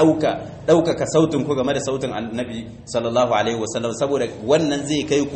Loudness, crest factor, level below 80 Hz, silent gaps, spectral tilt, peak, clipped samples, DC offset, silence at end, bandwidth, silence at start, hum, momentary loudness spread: -21 LUFS; 16 dB; -50 dBFS; none; -5 dB/octave; -4 dBFS; under 0.1%; under 0.1%; 0 s; 8.8 kHz; 0 s; none; 9 LU